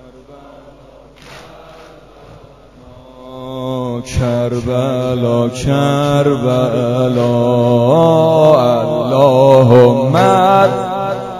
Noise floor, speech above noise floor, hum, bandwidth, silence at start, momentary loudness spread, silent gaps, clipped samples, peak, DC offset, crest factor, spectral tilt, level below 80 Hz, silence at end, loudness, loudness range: -40 dBFS; 29 dB; none; 13.5 kHz; 0.3 s; 11 LU; none; 0.2%; 0 dBFS; under 0.1%; 12 dB; -7 dB/octave; -40 dBFS; 0 s; -12 LUFS; 13 LU